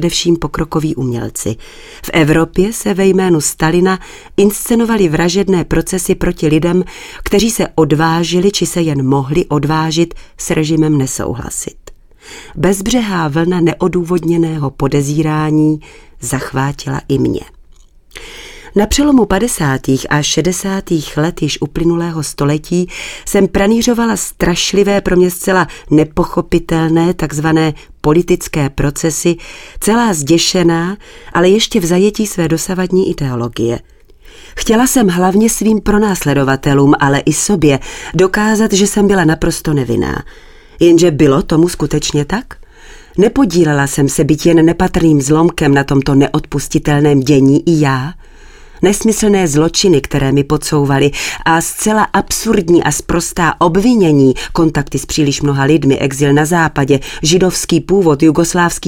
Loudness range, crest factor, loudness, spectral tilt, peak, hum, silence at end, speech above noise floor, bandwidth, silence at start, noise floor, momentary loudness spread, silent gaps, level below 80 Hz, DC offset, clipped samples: 4 LU; 12 dB; -12 LUFS; -5 dB/octave; 0 dBFS; none; 0 s; 30 dB; 17.5 kHz; 0 s; -42 dBFS; 8 LU; none; -30 dBFS; under 0.1%; under 0.1%